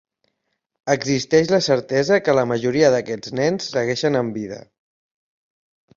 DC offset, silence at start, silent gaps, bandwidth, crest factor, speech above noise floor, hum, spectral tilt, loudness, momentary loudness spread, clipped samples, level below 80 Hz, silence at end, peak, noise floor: under 0.1%; 0.85 s; none; 7.6 kHz; 18 dB; 56 dB; none; -5 dB/octave; -19 LUFS; 10 LU; under 0.1%; -58 dBFS; 1.35 s; -4 dBFS; -75 dBFS